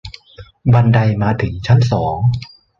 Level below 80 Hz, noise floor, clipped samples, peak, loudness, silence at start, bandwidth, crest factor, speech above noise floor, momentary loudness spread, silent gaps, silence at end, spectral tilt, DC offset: -38 dBFS; -41 dBFS; under 0.1%; 0 dBFS; -15 LUFS; 0.05 s; 7 kHz; 14 dB; 28 dB; 10 LU; none; 0.35 s; -8 dB/octave; under 0.1%